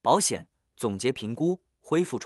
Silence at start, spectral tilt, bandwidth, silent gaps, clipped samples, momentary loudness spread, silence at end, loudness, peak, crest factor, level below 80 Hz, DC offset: 0.05 s; -4.5 dB/octave; 13.5 kHz; none; under 0.1%; 11 LU; 0 s; -28 LUFS; -8 dBFS; 20 dB; -68 dBFS; under 0.1%